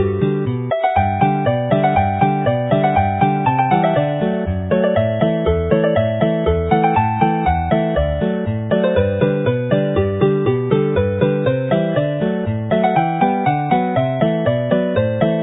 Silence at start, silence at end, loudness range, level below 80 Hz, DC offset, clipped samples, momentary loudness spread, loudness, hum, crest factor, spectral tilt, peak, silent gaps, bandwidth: 0 s; 0 s; 1 LU; -32 dBFS; under 0.1%; under 0.1%; 3 LU; -17 LUFS; none; 16 dB; -13 dB/octave; 0 dBFS; none; 4 kHz